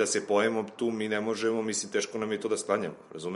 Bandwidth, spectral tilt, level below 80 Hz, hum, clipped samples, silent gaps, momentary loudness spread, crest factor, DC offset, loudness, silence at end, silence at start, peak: 11.5 kHz; -3.5 dB/octave; -76 dBFS; none; under 0.1%; none; 6 LU; 18 dB; under 0.1%; -30 LUFS; 0 s; 0 s; -12 dBFS